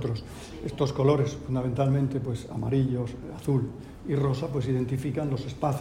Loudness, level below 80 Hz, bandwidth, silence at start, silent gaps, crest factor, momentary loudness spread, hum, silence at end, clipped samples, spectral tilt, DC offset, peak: -28 LUFS; -48 dBFS; 11 kHz; 0 s; none; 18 dB; 11 LU; none; 0 s; under 0.1%; -8 dB/octave; under 0.1%; -10 dBFS